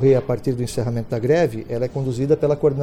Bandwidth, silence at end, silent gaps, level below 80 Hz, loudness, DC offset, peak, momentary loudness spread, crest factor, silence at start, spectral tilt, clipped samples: 15 kHz; 0 s; none; -44 dBFS; -21 LUFS; under 0.1%; -6 dBFS; 7 LU; 14 dB; 0 s; -7.5 dB/octave; under 0.1%